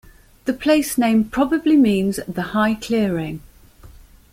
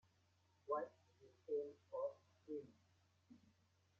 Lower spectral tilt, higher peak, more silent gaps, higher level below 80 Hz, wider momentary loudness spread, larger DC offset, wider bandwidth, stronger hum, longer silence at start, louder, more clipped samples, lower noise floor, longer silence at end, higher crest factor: about the same, -5.5 dB/octave vs -5.5 dB/octave; first, -4 dBFS vs -30 dBFS; neither; first, -46 dBFS vs under -90 dBFS; second, 11 LU vs 22 LU; neither; first, 16.5 kHz vs 7.2 kHz; neither; second, 0.45 s vs 0.65 s; first, -19 LUFS vs -49 LUFS; neither; second, -45 dBFS vs -78 dBFS; second, 0.4 s vs 0.6 s; second, 16 dB vs 22 dB